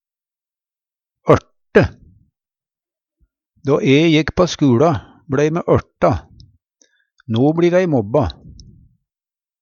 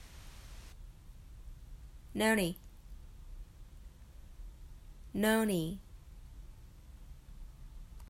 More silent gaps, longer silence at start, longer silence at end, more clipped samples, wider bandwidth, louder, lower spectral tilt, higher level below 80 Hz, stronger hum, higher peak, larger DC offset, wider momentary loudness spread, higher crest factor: neither; first, 1.25 s vs 0 s; first, 1.3 s vs 0 s; neither; second, 7.4 kHz vs 16 kHz; first, -16 LUFS vs -33 LUFS; first, -7 dB/octave vs -4.5 dB/octave; first, -42 dBFS vs -52 dBFS; neither; first, 0 dBFS vs -16 dBFS; neither; second, 10 LU vs 26 LU; about the same, 18 dB vs 22 dB